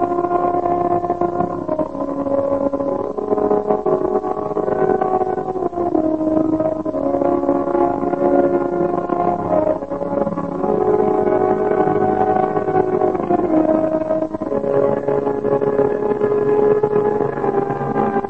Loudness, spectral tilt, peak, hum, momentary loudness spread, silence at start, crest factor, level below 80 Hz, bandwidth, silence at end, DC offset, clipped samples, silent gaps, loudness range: -18 LUFS; -9.5 dB/octave; -2 dBFS; none; 5 LU; 0 s; 16 dB; -48 dBFS; 6.4 kHz; 0 s; 0.7%; under 0.1%; none; 2 LU